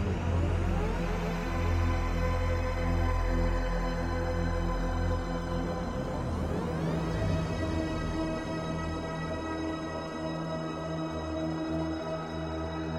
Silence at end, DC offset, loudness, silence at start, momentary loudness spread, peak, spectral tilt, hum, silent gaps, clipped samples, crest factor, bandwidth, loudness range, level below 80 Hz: 0 s; under 0.1%; -32 LUFS; 0 s; 5 LU; -18 dBFS; -7 dB/octave; none; none; under 0.1%; 14 dB; 13 kHz; 4 LU; -36 dBFS